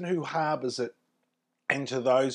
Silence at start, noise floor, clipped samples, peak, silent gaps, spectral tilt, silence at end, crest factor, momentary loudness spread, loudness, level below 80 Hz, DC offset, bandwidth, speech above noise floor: 0 s; -79 dBFS; under 0.1%; -8 dBFS; none; -5 dB/octave; 0 s; 22 dB; 10 LU; -30 LUFS; -84 dBFS; under 0.1%; 11 kHz; 51 dB